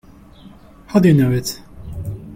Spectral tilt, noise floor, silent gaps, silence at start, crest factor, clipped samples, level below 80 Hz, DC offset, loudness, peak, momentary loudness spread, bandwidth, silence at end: -7 dB/octave; -42 dBFS; none; 0.45 s; 16 dB; under 0.1%; -42 dBFS; under 0.1%; -16 LUFS; -2 dBFS; 19 LU; 16.5 kHz; 0 s